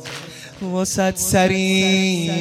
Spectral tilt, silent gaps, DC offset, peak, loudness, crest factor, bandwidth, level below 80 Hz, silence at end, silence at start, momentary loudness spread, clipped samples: -4 dB/octave; none; under 0.1%; -2 dBFS; -18 LUFS; 16 dB; 15.5 kHz; -48 dBFS; 0 s; 0 s; 16 LU; under 0.1%